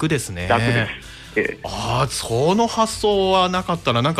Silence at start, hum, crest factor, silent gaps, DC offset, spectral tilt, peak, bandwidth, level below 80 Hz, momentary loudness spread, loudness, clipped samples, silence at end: 0 s; none; 14 dB; none; under 0.1%; -4.5 dB/octave; -4 dBFS; 15.5 kHz; -42 dBFS; 8 LU; -20 LUFS; under 0.1%; 0 s